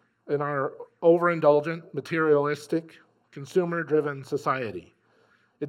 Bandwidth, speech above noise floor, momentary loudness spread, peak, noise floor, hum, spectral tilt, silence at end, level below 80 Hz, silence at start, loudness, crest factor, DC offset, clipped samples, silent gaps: 13 kHz; 39 dB; 12 LU; -8 dBFS; -64 dBFS; none; -7 dB/octave; 0 s; -78 dBFS; 0.25 s; -26 LUFS; 20 dB; under 0.1%; under 0.1%; none